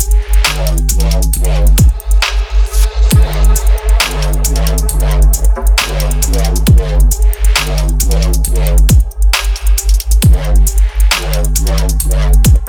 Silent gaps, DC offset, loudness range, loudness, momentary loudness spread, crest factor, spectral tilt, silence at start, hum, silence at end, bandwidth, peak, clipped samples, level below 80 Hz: none; under 0.1%; 1 LU; -12 LUFS; 4 LU; 8 dB; -4 dB/octave; 0 s; none; 0 s; 19 kHz; 0 dBFS; under 0.1%; -10 dBFS